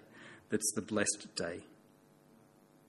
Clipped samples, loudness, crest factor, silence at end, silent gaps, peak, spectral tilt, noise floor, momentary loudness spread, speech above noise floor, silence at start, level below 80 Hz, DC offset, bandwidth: under 0.1%; -36 LUFS; 22 dB; 1.15 s; none; -18 dBFS; -2.5 dB/octave; -64 dBFS; 18 LU; 28 dB; 0.1 s; -76 dBFS; under 0.1%; 13 kHz